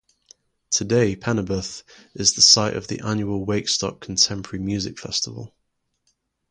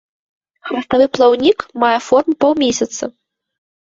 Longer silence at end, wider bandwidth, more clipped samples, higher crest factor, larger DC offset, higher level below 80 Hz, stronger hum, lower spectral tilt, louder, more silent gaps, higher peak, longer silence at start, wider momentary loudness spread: first, 1.05 s vs 0.8 s; first, 11.5 kHz vs 7.8 kHz; neither; first, 22 dB vs 14 dB; neither; about the same, -50 dBFS vs -54 dBFS; neither; about the same, -3 dB/octave vs -3.5 dB/octave; second, -20 LUFS vs -15 LUFS; neither; about the same, 0 dBFS vs 0 dBFS; about the same, 0.7 s vs 0.65 s; about the same, 15 LU vs 13 LU